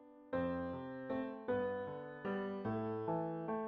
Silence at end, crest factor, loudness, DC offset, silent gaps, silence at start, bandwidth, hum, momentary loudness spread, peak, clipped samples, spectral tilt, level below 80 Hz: 0 s; 14 dB; -41 LUFS; under 0.1%; none; 0 s; 5.4 kHz; none; 5 LU; -26 dBFS; under 0.1%; -6.5 dB/octave; -70 dBFS